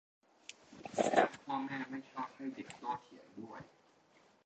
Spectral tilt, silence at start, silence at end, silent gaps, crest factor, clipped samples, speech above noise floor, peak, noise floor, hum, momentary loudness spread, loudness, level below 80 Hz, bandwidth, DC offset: -4.5 dB/octave; 0.5 s; 0.8 s; none; 26 dB; under 0.1%; 23 dB; -14 dBFS; -68 dBFS; none; 22 LU; -38 LUFS; -80 dBFS; 8.8 kHz; under 0.1%